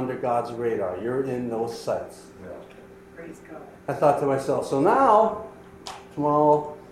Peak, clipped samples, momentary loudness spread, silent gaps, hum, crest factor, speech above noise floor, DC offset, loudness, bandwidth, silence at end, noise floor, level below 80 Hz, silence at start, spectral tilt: -6 dBFS; under 0.1%; 23 LU; none; 60 Hz at -50 dBFS; 18 dB; 23 dB; under 0.1%; -23 LUFS; 14 kHz; 0 s; -47 dBFS; -60 dBFS; 0 s; -6.5 dB/octave